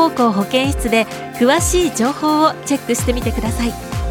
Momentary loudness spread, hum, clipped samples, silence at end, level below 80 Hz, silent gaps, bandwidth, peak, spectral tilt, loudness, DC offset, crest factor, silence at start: 7 LU; none; under 0.1%; 0 s; -28 dBFS; none; 19 kHz; -2 dBFS; -4.5 dB/octave; -17 LUFS; under 0.1%; 16 dB; 0 s